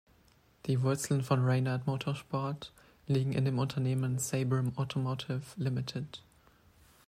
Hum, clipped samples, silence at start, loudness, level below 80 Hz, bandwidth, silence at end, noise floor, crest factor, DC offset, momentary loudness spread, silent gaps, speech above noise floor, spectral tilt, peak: none; under 0.1%; 0.65 s; -33 LUFS; -66 dBFS; 14.5 kHz; 0.85 s; -65 dBFS; 16 dB; under 0.1%; 12 LU; none; 33 dB; -6 dB/octave; -16 dBFS